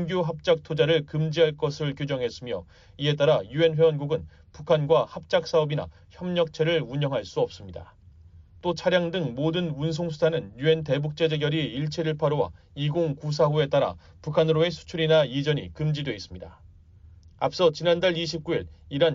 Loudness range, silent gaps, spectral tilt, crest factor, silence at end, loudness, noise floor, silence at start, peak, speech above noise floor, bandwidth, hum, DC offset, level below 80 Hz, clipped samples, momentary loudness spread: 3 LU; none; -5 dB/octave; 16 dB; 0 s; -25 LUFS; -51 dBFS; 0 s; -10 dBFS; 26 dB; 7.6 kHz; none; under 0.1%; -54 dBFS; under 0.1%; 10 LU